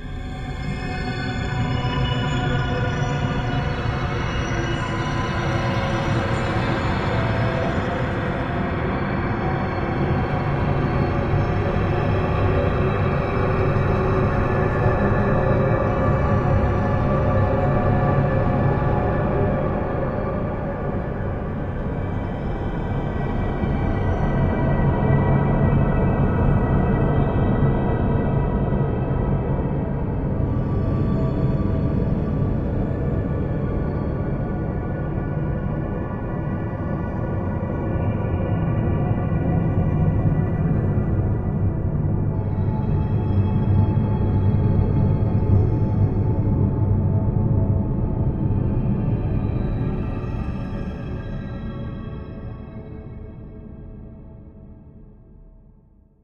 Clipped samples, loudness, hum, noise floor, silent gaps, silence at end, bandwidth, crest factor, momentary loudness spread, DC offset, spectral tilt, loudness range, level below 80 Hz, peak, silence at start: under 0.1%; -22 LUFS; none; -52 dBFS; none; 0.75 s; 7.4 kHz; 16 dB; 8 LU; under 0.1%; -8.5 dB/octave; 6 LU; -30 dBFS; -6 dBFS; 0 s